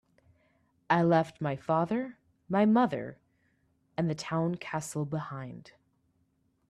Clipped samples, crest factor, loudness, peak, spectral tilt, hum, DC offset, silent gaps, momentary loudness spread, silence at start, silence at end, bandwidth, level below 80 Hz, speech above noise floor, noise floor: under 0.1%; 22 dB; -30 LUFS; -10 dBFS; -7 dB/octave; none; under 0.1%; none; 17 LU; 0.9 s; 1.1 s; 13 kHz; -70 dBFS; 44 dB; -73 dBFS